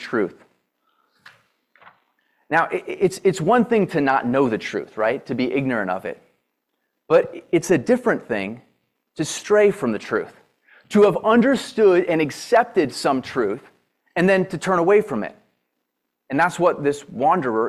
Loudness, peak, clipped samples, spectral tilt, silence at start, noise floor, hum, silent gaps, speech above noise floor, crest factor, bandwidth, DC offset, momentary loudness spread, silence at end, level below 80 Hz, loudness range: -20 LUFS; -4 dBFS; under 0.1%; -5.5 dB/octave; 0 s; -77 dBFS; none; none; 58 dB; 16 dB; 13 kHz; under 0.1%; 11 LU; 0 s; -62 dBFS; 4 LU